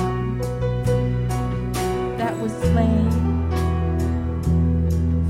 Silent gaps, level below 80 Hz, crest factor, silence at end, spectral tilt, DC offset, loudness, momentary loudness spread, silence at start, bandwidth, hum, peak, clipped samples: none; -28 dBFS; 12 dB; 0 s; -7.5 dB/octave; under 0.1%; -22 LUFS; 5 LU; 0 s; 14.5 kHz; none; -8 dBFS; under 0.1%